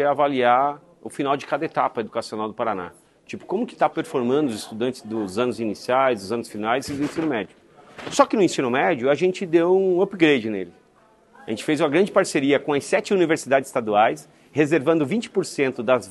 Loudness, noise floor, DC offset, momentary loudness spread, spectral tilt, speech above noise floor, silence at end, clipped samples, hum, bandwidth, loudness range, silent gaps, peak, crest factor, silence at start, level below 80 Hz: -22 LUFS; -56 dBFS; under 0.1%; 11 LU; -5 dB/octave; 35 dB; 0 s; under 0.1%; none; 12.5 kHz; 5 LU; none; -2 dBFS; 20 dB; 0 s; -66 dBFS